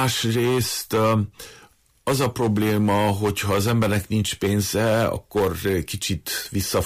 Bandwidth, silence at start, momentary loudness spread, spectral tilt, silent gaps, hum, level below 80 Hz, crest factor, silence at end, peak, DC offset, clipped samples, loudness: 15.5 kHz; 0 s; 6 LU; -5 dB/octave; none; none; -46 dBFS; 12 dB; 0 s; -10 dBFS; under 0.1%; under 0.1%; -22 LUFS